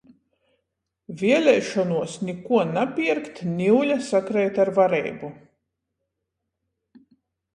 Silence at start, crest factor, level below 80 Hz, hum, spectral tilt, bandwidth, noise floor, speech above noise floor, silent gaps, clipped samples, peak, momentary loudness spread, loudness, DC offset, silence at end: 1.1 s; 18 dB; -68 dBFS; none; -6 dB/octave; 11 kHz; -81 dBFS; 59 dB; none; under 0.1%; -6 dBFS; 12 LU; -22 LUFS; under 0.1%; 2.15 s